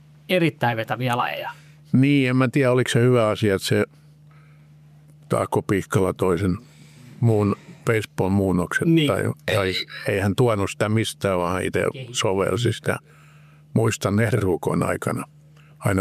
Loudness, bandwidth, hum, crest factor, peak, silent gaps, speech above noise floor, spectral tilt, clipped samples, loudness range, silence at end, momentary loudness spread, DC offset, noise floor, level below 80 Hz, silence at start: -22 LUFS; 15 kHz; none; 14 dB; -8 dBFS; none; 28 dB; -6 dB/octave; under 0.1%; 4 LU; 0 s; 8 LU; under 0.1%; -49 dBFS; -56 dBFS; 0.3 s